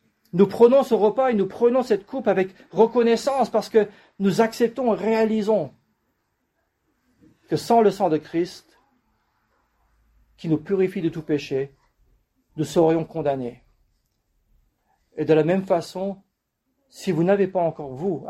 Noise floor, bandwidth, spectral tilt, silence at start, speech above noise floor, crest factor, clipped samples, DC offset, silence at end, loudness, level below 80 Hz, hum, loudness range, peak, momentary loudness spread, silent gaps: -75 dBFS; 13.5 kHz; -7 dB/octave; 0.35 s; 54 dB; 20 dB; under 0.1%; under 0.1%; 0 s; -22 LUFS; -62 dBFS; none; 7 LU; -4 dBFS; 12 LU; none